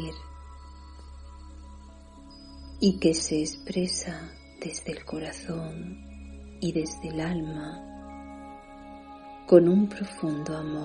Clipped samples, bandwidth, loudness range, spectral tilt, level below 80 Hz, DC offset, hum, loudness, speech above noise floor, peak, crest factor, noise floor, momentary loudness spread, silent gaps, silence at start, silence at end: under 0.1%; 10 kHz; 9 LU; -5.5 dB/octave; -48 dBFS; under 0.1%; none; -27 LUFS; 21 dB; -4 dBFS; 24 dB; -48 dBFS; 24 LU; none; 0 s; 0 s